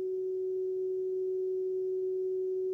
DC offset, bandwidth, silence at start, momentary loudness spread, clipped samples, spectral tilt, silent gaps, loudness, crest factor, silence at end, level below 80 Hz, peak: under 0.1%; 0.8 kHz; 0 s; 1 LU; under 0.1%; -9.5 dB/octave; none; -34 LUFS; 4 dB; 0 s; -82 dBFS; -28 dBFS